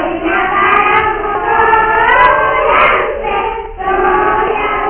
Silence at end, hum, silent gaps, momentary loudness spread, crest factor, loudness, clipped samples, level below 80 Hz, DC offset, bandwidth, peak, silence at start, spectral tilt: 0 s; none; none; 8 LU; 12 dB; -11 LUFS; 0.1%; -32 dBFS; under 0.1%; 4 kHz; 0 dBFS; 0 s; -7.5 dB/octave